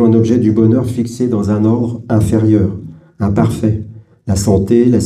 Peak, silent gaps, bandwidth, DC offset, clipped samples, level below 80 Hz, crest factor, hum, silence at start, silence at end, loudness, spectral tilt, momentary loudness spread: 0 dBFS; none; 13.5 kHz; under 0.1%; under 0.1%; -36 dBFS; 12 dB; none; 0 s; 0 s; -13 LUFS; -8 dB/octave; 9 LU